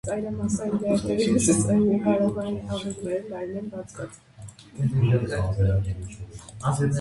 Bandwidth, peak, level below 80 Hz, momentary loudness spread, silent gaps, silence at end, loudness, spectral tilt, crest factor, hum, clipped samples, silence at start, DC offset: 11.5 kHz; -8 dBFS; -42 dBFS; 18 LU; none; 0 s; -25 LUFS; -6.5 dB/octave; 16 dB; none; under 0.1%; 0.05 s; under 0.1%